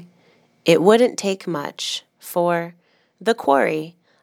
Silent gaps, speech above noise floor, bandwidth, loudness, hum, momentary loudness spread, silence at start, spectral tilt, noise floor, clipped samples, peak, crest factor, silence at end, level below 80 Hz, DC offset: none; 39 dB; 18 kHz; -20 LUFS; none; 13 LU; 0 s; -4.5 dB/octave; -58 dBFS; under 0.1%; 0 dBFS; 20 dB; 0.35 s; -76 dBFS; under 0.1%